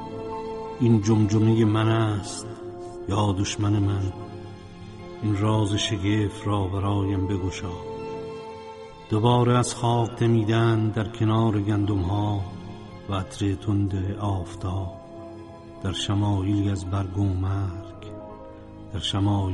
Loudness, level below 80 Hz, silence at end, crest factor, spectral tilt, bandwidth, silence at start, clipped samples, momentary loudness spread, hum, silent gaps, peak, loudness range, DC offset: -25 LUFS; -48 dBFS; 0 s; 16 dB; -6.5 dB/octave; 11.5 kHz; 0 s; under 0.1%; 19 LU; none; none; -8 dBFS; 5 LU; under 0.1%